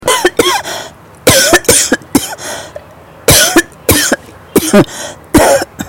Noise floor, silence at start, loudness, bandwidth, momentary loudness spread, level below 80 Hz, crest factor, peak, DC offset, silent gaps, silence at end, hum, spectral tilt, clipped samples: -35 dBFS; 0 s; -9 LUFS; over 20 kHz; 16 LU; -32 dBFS; 12 dB; 0 dBFS; under 0.1%; none; 0 s; none; -2.5 dB/octave; 0.3%